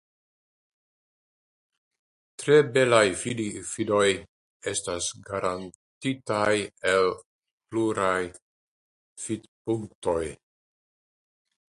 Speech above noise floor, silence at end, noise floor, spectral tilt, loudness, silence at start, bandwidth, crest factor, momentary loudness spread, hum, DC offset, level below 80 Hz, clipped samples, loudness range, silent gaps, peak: over 65 dB; 1.35 s; under -90 dBFS; -4 dB/octave; -26 LUFS; 2.4 s; 11.5 kHz; 24 dB; 14 LU; none; under 0.1%; -58 dBFS; under 0.1%; 7 LU; 4.29-4.60 s, 5.75-6.01 s, 7.26-7.40 s, 7.51-7.58 s, 8.42-9.16 s, 9.48-9.65 s, 9.95-10.02 s; -4 dBFS